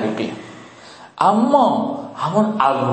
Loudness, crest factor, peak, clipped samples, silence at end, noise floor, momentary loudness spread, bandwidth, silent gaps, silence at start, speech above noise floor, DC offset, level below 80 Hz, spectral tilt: -18 LUFS; 16 dB; -2 dBFS; under 0.1%; 0 s; -41 dBFS; 19 LU; 8.8 kHz; none; 0 s; 24 dB; under 0.1%; -62 dBFS; -6.5 dB/octave